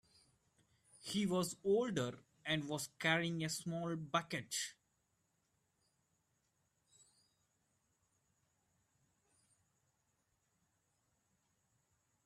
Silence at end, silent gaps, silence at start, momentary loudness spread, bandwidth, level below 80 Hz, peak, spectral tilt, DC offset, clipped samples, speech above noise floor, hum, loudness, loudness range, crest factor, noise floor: 7.55 s; none; 1 s; 8 LU; 14 kHz; -80 dBFS; -20 dBFS; -4 dB/octave; under 0.1%; under 0.1%; 43 dB; none; -39 LUFS; 9 LU; 24 dB; -82 dBFS